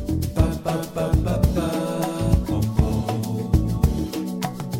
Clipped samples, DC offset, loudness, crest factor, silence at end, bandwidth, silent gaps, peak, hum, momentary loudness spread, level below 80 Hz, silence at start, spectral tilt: under 0.1%; under 0.1%; -23 LUFS; 18 dB; 0 s; 17 kHz; none; -2 dBFS; none; 5 LU; -28 dBFS; 0 s; -7 dB/octave